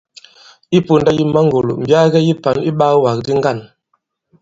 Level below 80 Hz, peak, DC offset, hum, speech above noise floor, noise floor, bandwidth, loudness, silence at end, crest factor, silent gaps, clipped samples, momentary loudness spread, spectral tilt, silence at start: -50 dBFS; 0 dBFS; under 0.1%; none; 53 dB; -66 dBFS; 7.8 kHz; -14 LUFS; 0.75 s; 14 dB; none; under 0.1%; 5 LU; -7 dB/octave; 0.7 s